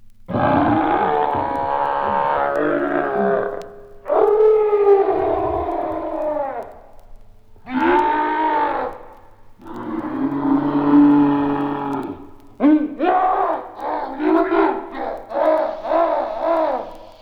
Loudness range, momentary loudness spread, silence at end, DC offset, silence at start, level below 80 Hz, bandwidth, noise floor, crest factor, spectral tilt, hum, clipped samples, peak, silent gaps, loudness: 4 LU; 13 LU; 0.1 s; under 0.1%; 0 s; -46 dBFS; 5.4 kHz; -43 dBFS; 16 dB; -8.5 dB/octave; none; under 0.1%; -4 dBFS; none; -19 LUFS